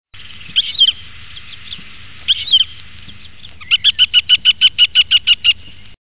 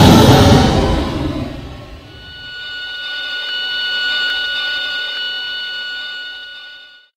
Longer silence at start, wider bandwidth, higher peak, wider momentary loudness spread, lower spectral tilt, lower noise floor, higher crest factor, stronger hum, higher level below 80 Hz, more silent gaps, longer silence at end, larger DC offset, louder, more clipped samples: about the same, 0.05 s vs 0 s; second, 4 kHz vs 16 kHz; about the same, 0 dBFS vs 0 dBFS; about the same, 22 LU vs 23 LU; second, 4 dB/octave vs -5 dB/octave; about the same, -39 dBFS vs -39 dBFS; about the same, 14 dB vs 16 dB; neither; second, -46 dBFS vs -30 dBFS; neither; second, 0.05 s vs 0.3 s; first, 2% vs under 0.1%; first, -10 LUFS vs -15 LUFS; neither